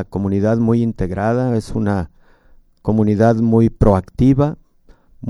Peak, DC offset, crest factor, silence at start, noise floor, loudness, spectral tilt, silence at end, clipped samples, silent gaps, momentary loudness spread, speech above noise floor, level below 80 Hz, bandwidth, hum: 0 dBFS; under 0.1%; 16 dB; 0 s; -49 dBFS; -16 LUFS; -9.5 dB/octave; 0 s; under 0.1%; none; 7 LU; 34 dB; -32 dBFS; 11 kHz; none